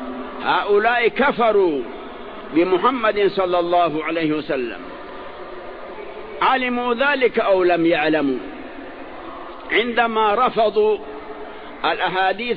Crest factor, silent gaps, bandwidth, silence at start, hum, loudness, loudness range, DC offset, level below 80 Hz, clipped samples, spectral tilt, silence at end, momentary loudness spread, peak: 16 dB; none; 5.2 kHz; 0 s; none; -19 LUFS; 4 LU; 0.8%; -50 dBFS; under 0.1%; -8 dB/octave; 0 s; 18 LU; -4 dBFS